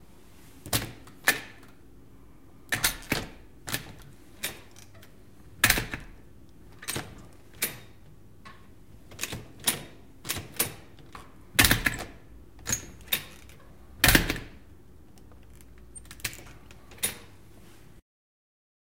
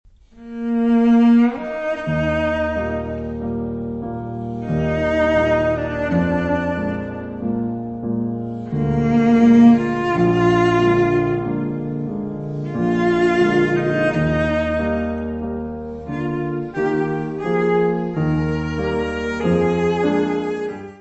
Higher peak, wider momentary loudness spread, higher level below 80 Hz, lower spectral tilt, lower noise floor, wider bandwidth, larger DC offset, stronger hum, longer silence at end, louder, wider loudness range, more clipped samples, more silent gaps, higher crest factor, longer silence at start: about the same, 0 dBFS vs -2 dBFS; first, 27 LU vs 12 LU; second, -46 dBFS vs -38 dBFS; second, -2 dB/octave vs -8 dB/octave; first, -54 dBFS vs -39 dBFS; first, 17 kHz vs 8 kHz; first, 0.3% vs under 0.1%; neither; first, 1.75 s vs 0.05 s; second, -28 LUFS vs -19 LUFS; first, 11 LU vs 7 LU; neither; neither; first, 32 dB vs 16 dB; first, 0.65 s vs 0.35 s